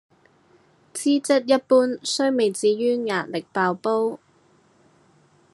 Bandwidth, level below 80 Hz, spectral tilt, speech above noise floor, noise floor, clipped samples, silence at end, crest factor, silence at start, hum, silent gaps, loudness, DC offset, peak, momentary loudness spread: 12.5 kHz; -80 dBFS; -4 dB/octave; 38 dB; -59 dBFS; under 0.1%; 1.35 s; 18 dB; 0.95 s; none; none; -22 LUFS; under 0.1%; -6 dBFS; 8 LU